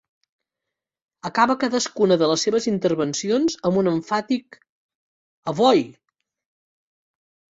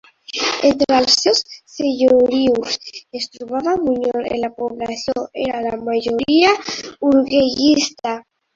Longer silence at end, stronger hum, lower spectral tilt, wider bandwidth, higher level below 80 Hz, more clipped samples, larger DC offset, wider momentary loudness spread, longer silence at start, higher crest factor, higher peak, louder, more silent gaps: first, 1.65 s vs 0.35 s; neither; first, -4.5 dB/octave vs -3 dB/octave; about the same, 8 kHz vs 7.8 kHz; second, -64 dBFS vs -52 dBFS; neither; neither; second, 9 LU vs 12 LU; first, 1.25 s vs 0.3 s; about the same, 20 dB vs 18 dB; second, -4 dBFS vs 0 dBFS; second, -21 LUFS vs -17 LUFS; first, 4.69-4.89 s, 4.95-5.43 s vs none